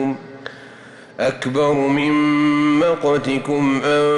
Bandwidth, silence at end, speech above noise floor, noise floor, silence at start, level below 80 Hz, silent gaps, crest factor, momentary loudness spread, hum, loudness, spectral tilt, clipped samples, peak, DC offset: 10.5 kHz; 0 s; 24 dB; -41 dBFS; 0 s; -54 dBFS; none; 10 dB; 17 LU; none; -17 LUFS; -6 dB/octave; under 0.1%; -8 dBFS; under 0.1%